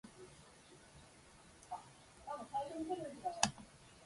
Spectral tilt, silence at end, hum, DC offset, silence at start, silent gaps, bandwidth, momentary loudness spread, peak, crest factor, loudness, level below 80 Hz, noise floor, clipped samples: -2.5 dB/octave; 0 s; none; under 0.1%; 0.05 s; none; 11.5 kHz; 23 LU; -12 dBFS; 34 dB; -43 LUFS; -70 dBFS; -62 dBFS; under 0.1%